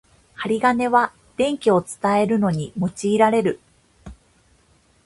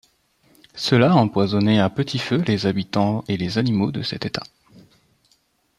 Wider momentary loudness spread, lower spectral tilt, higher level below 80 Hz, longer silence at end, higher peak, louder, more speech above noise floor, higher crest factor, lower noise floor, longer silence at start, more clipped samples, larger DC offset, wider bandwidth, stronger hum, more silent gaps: about the same, 9 LU vs 10 LU; about the same, -6 dB/octave vs -6.5 dB/octave; about the same, -54 dBFS vs -56 dBFS; second, 0.95 s vs 1.35 s; about the same, -2 dBFS vs -2 dBFS; about the same, -20 LUFS vs -20 LUFS; second, 39 dB vs 44 dB; about the same, 20 dB vs 18 dB; second, -58 dBFS vs -64 dBFS; second, 0.4 s vs 0.75 s; neither; neither; about the same, 11.5 kHz vs 12.5 kHz; neither; neither